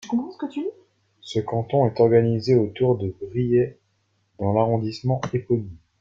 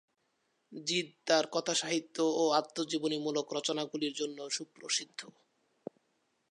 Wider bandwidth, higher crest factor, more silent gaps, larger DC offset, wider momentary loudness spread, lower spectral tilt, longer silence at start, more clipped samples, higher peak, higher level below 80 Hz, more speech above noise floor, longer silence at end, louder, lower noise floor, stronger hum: second, 7.6 kHz vs 11.5 kHz; about the same, 18 dB vs 22 dB; neither; neither; second, 11 LU vs 20 LU; first, -8.5 dB/octave vs -2.5 dB/octave; second, 0.05 s vs 0.7 s; neither; first, -4 dBFS vs -12 dBFS; first, -56 dBFS vs -90 dBFS; about the same, 47 dB vs 45 dB; second, 0.25 s vs 1.2 s; first, -23 LUFS vs -33 LUFS; second, -68 dBFS vs -78 dBFS; neither